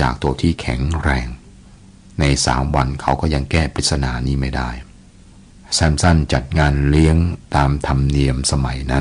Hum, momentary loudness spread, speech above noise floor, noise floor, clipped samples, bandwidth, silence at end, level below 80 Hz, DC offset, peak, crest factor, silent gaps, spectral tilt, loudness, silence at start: none; 7 LU; 27 dB; -44 dBFS; under 0.1%; 10.5 kHz; 0 s; -24 dBFS; under 0.1%; -2 dBFS; 14 dB; none; -5 dB/octave; -18 LUFS; 0 s